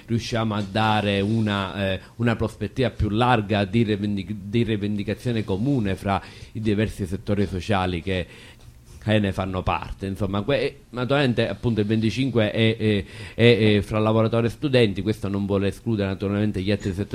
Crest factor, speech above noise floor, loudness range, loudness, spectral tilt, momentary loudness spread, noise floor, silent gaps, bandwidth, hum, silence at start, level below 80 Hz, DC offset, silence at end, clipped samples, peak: 18 dB; 22 dB; 5 LU; -23 LUFS; -7 dB/octave; 7 LU; -45 dBFS; none; 13 kHz; none; 0.05 s; -44 dBFS; under 0.1%; 0 s; under 0.1%; -4 dBFS